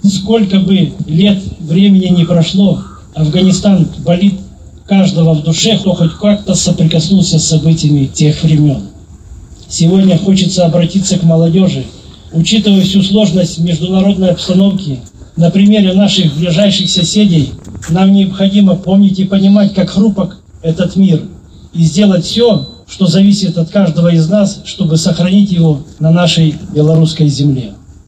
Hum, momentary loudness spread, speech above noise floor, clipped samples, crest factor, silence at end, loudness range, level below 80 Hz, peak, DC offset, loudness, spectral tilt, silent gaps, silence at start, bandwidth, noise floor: none; 7 LU; 23 dB; under 0.1%; 10 dB; 0.15 s; 2 LU; -36 dBFS; 0 dBFS; under 0.1%; -10 LUFS; -6 dB/octave; none; 0.05 s; 9.2 kHz; -32 dBFS